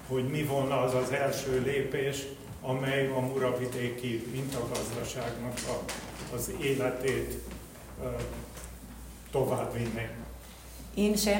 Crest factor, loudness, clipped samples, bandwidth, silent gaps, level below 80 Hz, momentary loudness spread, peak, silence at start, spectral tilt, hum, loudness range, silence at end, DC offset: 18 dB; -32 LUFS; under 0.1%; 16.5 kHz; none; -50 dBFS; 15 LU; -16 dBFS; 0 s; -5 dB/octave; none; 5 LU; 0 s; under 0.1%